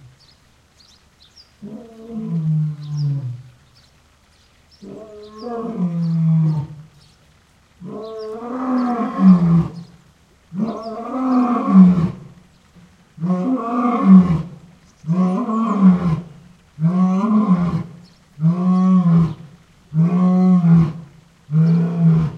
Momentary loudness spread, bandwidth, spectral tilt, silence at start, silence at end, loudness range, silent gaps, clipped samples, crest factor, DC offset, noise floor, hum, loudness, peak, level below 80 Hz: 22 LU; 6 kHz; -10 dB/octave; 1.6 s; 0 s; 10 LU; none; under 0.1%; 18 dB; under 0.1%; -54 dBFS; none; -17 LUFS; 0 dBFS; -48 dBFS